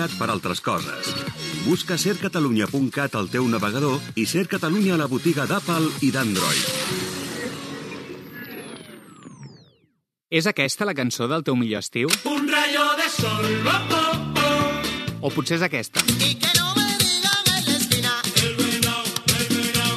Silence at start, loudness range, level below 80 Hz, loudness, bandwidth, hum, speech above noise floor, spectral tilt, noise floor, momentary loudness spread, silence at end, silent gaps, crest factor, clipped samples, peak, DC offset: 0 s; 8 LU; -54 dBFS; -21 LUFS; 13.5 kHz; none; 45 dB; -3.5 dB/octave; -68 dBFS; 10 LU; 0 s; none; 20 dB; under 0.1%; -2 dBFS; under 0.1%